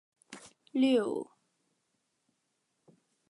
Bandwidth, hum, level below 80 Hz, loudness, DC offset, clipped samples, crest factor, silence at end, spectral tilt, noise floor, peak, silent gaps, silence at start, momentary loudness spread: 11.5 kHz; none; -86 dBFS; -30 LUFS; under 0.1%; under 0.1%; 18 dB; 2.05 s; -5 dB/octave; -80 dBFS; -18 dBFS; none; 0.3 s; 23 LU